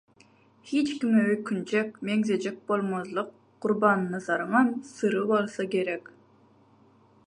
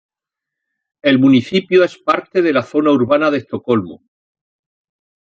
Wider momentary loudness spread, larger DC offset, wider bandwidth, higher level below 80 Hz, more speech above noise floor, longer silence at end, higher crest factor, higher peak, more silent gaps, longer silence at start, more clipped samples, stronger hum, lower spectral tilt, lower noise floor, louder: about the same, 8 LU vs 7 LU; neither; first, 10.5 kHz vs 7.4 kHz; second, -76 dBFS vs -60 dBFS; second, 33 dB vs 70 dB; about the same, 1.25 s vs 1.35 s; first, 22 dB vs 16 dB; second, -6 dBFS vs -2 dBFS; neither; second, 0.65 s vs 1.05 s; neither; neither; about the same, -6 dB/octave vs -7 dB/octave; second, -60 dBFS vs -84 dBFS; second, -27 LUFS vs -15 LUFS